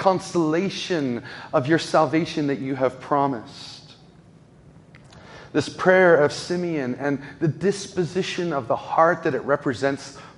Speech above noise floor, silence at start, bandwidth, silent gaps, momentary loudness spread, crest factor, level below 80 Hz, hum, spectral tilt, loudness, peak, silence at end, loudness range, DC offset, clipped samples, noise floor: 28 dB; 0 s; 11.5 kHz; none; 9 LU; 22 dB; -60 dBFS; none; -5.5 dB/octave; -22 LUFS; -2 dBFS; 0.1 s; 6 LU; under 0.1%; under 0.1%; -50 dBFS